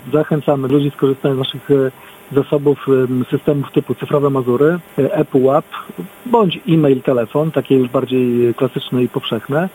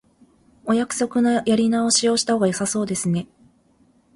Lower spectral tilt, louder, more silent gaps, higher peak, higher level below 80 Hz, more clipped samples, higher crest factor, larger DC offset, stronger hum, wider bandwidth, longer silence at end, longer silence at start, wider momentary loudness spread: first, -8 dB/octave vs -4 dB/octave; first, -16 LUFS vs -20 LUFS; neither; first, 0 dBFS vs -6 dBFS; about the same, -56 dBFS vs -60 dBFS; neither; about the same, 16 dB vs 14 dB; neither; neither; first, 17 kHz vs 11.5 kHz; second, 0.05 s vs 0.9 s; second, 0.05 s vs 0.65 s; about the same, 5 LU vs 7 LU